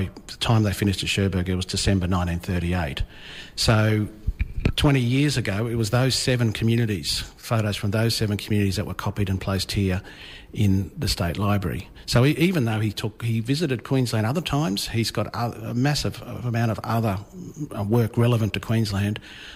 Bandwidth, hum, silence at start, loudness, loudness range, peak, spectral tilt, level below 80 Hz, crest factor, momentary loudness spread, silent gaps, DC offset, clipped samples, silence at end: 16 kHz; none; 0 s; -24 LUFS; 3 LU; -10 dBFS; -5.5 dB/octave; -38 dBFS; 14 dB; 10 LU; none; under 0.1%; under 0.1%; 0 s